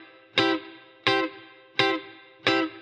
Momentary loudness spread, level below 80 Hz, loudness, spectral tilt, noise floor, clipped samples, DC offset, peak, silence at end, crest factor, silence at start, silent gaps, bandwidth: 9 LU; -74 dBFS; -26 LUFS; -4 dB/octave; -48 dBFS; under 0.1%; under 0.1%; -6 dBFS; 0 s; 22 dB; 0 s; none; 9 kHz